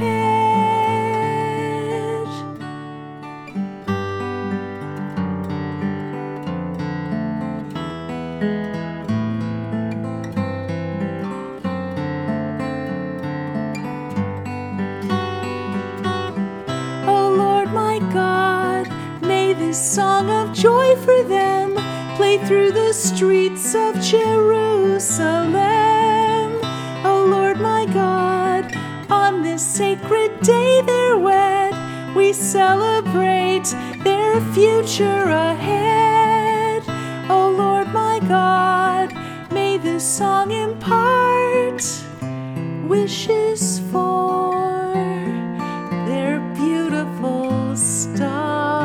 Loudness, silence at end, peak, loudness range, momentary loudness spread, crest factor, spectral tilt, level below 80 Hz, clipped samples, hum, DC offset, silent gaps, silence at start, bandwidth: -19 LUFS; 0 s; 0 dBFS; 9 LU; 12 LU; 18 dB; -4.5 dB/octave; -58 dBFS; under 0.1%; none; under 0.1%; none; 0 s; 17.5 kHz